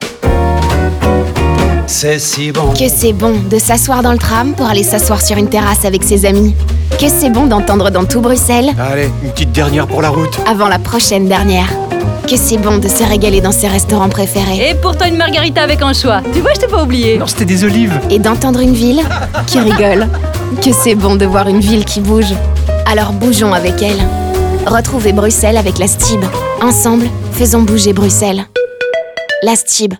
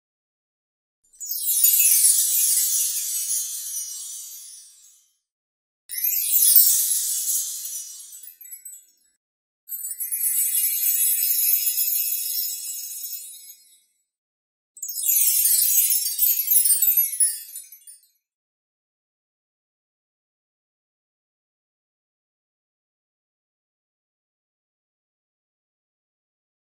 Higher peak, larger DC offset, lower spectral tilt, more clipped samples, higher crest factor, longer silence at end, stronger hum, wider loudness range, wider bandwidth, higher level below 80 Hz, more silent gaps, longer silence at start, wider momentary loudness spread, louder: about the same, 0 dBFS vs -2 dBFS; neither; first, -4.5 dB/octave vs 6.5 dB/octave; neither; second, 10 dB vs 24 dB; second, 0.05 s vs 8.75 s; neither; second, 1 LU vs 10 LU; first, over 20 kHz vs 16.5 kHz; first, -20 dBFS vs -78 dBFS; second, none vs 5.32-5.89 s, 9.17-9.67 s, 14.18-14.75 s; second, 0 s vs 1.2 s; second, 5 LU vs 21 LU; first, -10 LUFS vs -18 LUFS